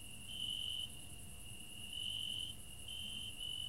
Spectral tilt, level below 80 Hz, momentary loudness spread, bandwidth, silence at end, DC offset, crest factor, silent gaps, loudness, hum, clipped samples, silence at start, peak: -1 dB/octave; -60 dBFS; 11 LU; 16 kHz; 0 s; 0.2%; 14 dB; none; -44 LUFS; none; under 0.1%; 0 s; -32 dBFS